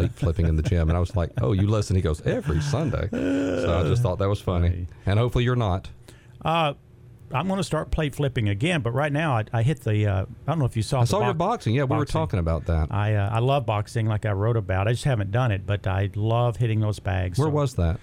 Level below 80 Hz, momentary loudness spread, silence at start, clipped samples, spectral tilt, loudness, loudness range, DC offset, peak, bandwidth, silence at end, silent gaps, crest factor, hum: -38 dBFS; 4 LU; 0 s; under 0.1%; -7 dB/octave; -24 LUFS; 2 LU; under 0.1%; -8 dBFS; 13 kHz; 0 s; none; 14 dB; none